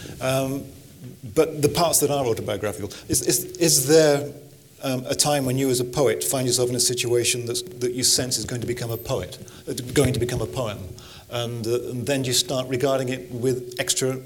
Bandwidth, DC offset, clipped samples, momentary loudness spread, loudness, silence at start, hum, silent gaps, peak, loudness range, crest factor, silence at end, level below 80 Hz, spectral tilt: 19 kHz; under 0.1%; under 0.1%; 14 LU; -22 LUFS; 0 s; none; none; -4 dBFS; 6 LU; 20 dB; 0 s; -50 dBFS; -3.5 dB/octave